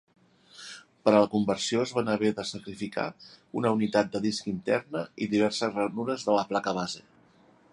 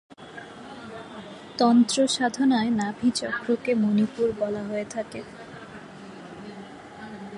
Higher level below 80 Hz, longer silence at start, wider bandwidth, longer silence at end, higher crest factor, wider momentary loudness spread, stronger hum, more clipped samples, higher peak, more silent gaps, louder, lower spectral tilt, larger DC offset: about the same, -66 dBFS vs -62 dBFS; first, 0.55 s vs 0.1 s; about the same, 11.5 kHz vs 11.5 kHz; first, 0.7 s vs 0 s; about the same, 22 dB vs 18 dB; second, 12 LU vs 21 LU; neither; neither; about the same, -6 dBFS vs -8 dBFS; neither; second, -28 LUFS vs -24 LUFS; about the same, -5 dB/octave vs -4.5 dB/octave; neither